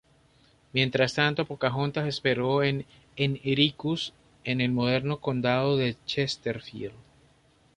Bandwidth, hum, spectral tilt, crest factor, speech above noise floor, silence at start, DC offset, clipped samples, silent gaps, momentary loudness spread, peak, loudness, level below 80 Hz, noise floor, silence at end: 10.5 kHz; none; -6 dB/octave; 20 dB; 35 dB; 0.75 s; under 0.1%; under 0.1%; none; 11 LU; -8 dBFS; -27 LUFS; -60 dBFS; -62 dBFS; 0.75 s